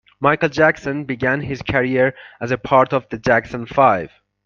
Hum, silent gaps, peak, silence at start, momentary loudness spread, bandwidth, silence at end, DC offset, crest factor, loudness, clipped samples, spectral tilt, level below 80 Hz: none; none; 0 dBFS; 0.2 s; 9 LU; 7.2 kHz; 0.4 s; under 0.1%; 18 dB; -18 LUFS; under 0.1%; -6.5 dB/octave; -48 dBFS